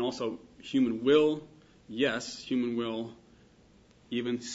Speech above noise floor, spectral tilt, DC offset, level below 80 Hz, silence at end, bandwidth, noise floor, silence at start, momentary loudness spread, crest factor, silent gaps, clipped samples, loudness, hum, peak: 30 dB; -5 dB/octave; under 0.1%; -68 dBFS; 0 s; 8 kHz; -60 dBFS; 0 s; 14 LU; 18 dB; none; under 0.1%; -30 LUFS; none; -12 dBFS